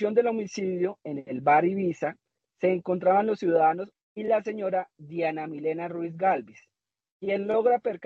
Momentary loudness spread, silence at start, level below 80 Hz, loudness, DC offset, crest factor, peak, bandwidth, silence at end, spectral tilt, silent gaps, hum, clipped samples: 11 LU; 0 s; -76 dBFS; -27 LUFS; under 0.1%; 18 dB; -10 dBFS; 7.6 kHz; 0 s; -7 dB/octave; 4.03-4.16 s, 7.12-7.20 s; none; under 0.1%